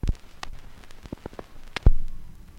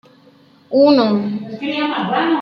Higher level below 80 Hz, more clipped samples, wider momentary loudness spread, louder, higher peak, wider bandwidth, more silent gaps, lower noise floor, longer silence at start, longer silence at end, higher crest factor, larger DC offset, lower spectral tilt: first, -26 dBFS vs -64 dBFS; neither; first, 23 LU vs 12 LU; second, -31 LUFS vs -16 LUFS; about the same, -4 dBFS vs -2 dBFS; first, 7.4 kHz vs 6 kHz; neither; second, -41 dBFS vs -49 dBFS; second, 0.05 s vs 0.7 s; first, 0.3 s vs 0 s; about the same, 20 dB vs 16 dB; neither; about the same, -6.5 dB/octave vs -7.5 dB/octave